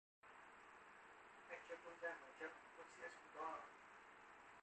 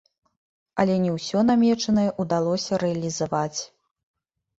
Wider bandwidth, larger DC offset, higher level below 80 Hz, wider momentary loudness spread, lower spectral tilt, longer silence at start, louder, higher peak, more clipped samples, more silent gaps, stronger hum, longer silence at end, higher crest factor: about the same, 8.4 kHz vs 8 kHz; neither; second, -90 dBFS vs -60 dBFS; about the same, 11 LU vs 9 LU; second, -3 dB/octave vs -5.5 dB/octave; second, 0.25 s vs 0.75 s; second, -57 LUFS vs -23 LUFS; second, -38 dBFS vs -6 dBFS; neither; neither; neither; second, 0 s vs 0.95 s; about the same, 20 dB vs 18 dB